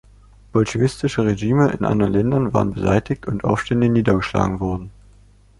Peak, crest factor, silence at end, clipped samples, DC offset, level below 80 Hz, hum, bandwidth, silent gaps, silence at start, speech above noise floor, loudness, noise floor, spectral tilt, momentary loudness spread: -4 dBFS; 16 dB; 0.7 s; under 0.1%; under 0.1%; -40 dBFS; none; 11.5 kHz; none; 0.55 s; 31 dB; -19 LUFS; -50 dBFS; -7.5 dB/octave; 6 LU